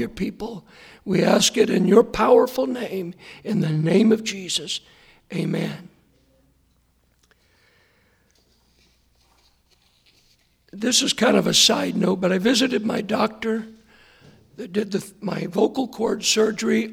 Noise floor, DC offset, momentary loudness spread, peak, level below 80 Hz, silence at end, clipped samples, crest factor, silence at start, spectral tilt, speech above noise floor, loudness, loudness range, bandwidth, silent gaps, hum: -63 dBFS; under 0.1%; 14 LU; -2 dBFS; -56 dBFS; 0 s; under 0.1%; 20 dB; 0 s; -4 dB/octave; 42 dB; -21 LUFS; 12 LU; 17 kHz; none; none